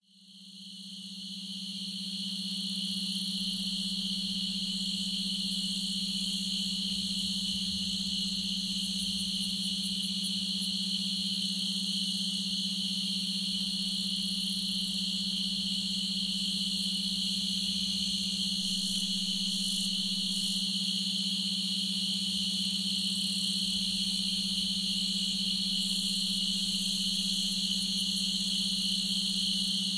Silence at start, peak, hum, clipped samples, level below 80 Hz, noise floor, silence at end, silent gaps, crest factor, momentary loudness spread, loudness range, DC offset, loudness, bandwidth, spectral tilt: 0.2 s; -18 dBFS; none; under 0.1%; -62 dBFS; -54 dBFS; 0 s; none; 14 dB; 3 LU; 3 LU; under 0.1%; -29 LUFS; 11 kHz; -2 dB/octave